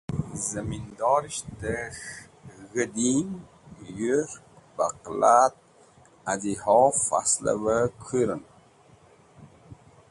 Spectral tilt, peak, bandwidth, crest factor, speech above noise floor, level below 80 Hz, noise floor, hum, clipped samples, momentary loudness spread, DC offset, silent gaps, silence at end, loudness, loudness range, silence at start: -4.5 dB/octave; -6 dBFS; 11.5 kHz; 20 dB; 31 dB; -54 dBFS; -56 dBFS; none; under 0.1%; 18 LU; under 0.1%; none; 0.35 s; -25 LUFS; 6 LU; 0.1 s